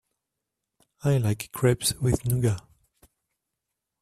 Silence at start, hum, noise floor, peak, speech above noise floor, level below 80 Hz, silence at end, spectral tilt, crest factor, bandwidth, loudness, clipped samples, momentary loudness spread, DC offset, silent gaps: 1.05 s; none; -85 dBFS; -8 dBFS; 60 dB; -48 dBFS; 1.4 s; -5.5 dB/octave; 20 dB; 14.5 kHz; -26 LUFS; under 0.1%; 6 LU; under 0.1%; none